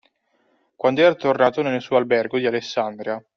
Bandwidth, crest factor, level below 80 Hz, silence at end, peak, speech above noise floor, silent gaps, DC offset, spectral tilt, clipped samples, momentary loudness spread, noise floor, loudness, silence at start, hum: 6.8 kHz; 18 dB; -66 dBFS; 0.15 s; -4 dBFS; 46 dB; none; under 0.1%; -3.5 dB/octave; under 0.1%; 8 LU; -65 dBFS; -20 LUFS; 0.85 s; none